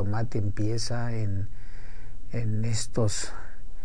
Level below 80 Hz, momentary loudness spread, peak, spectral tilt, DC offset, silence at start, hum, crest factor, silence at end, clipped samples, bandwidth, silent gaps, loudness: -38 dBFS; 19 LU; -12 dBFS; -5.5 dB/octave; 6%; 0 s; none; 14 dB; 0 s; under 0.1%; 10 kHz; none; -30 LUFS